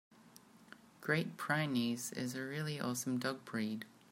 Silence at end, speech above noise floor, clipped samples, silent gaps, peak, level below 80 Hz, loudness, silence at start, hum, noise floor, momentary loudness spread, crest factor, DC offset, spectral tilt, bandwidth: 0.2 s; 24 dB; under 0.1%; none; -20 dBFS; -82 dBFS; -38 LUFS; 0.25 s; none; -62 dBFS; 11 LU; 20 dB; under 0.1%; -4.5 dB/octave; 16 kHz